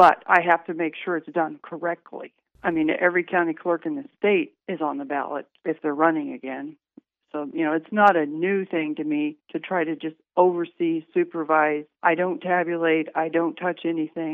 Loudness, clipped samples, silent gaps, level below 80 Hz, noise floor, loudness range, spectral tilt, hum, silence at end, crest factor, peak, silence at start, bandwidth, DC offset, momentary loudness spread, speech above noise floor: -24 LUFS; under 0.1%; none; -72 dBFS; -55 dBFS; 3 LU; -7.5 dB/octave; none; 0 s; 20 dB; -2 dBFS; 0 s; 6.2 kHz; under 0.1%; 12 LU; 32 dB